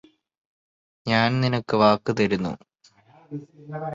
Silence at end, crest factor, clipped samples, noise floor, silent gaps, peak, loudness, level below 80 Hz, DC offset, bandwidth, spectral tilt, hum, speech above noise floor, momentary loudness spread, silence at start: 0 s; 22 dB; under 0.1%; -58 dBFS; none; -4 dBFS; -22 LUFS; -58 dBFS; under 0.1%; 7.6 kHz; -6.5 dB/octave; none; 35 dB; 19 LU; 1.05 s